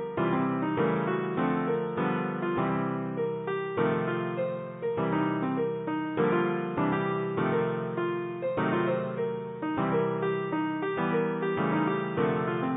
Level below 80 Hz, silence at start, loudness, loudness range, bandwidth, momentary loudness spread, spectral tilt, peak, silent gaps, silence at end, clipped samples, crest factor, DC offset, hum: -64 dBFS; 0 s; -29 LUFS; 1 LU; 4 kHz; 4 LU; -11.5 dB/octave; -14 dBFS; none; 0 s; under 0.1%; 16 dB; under 0.1%; none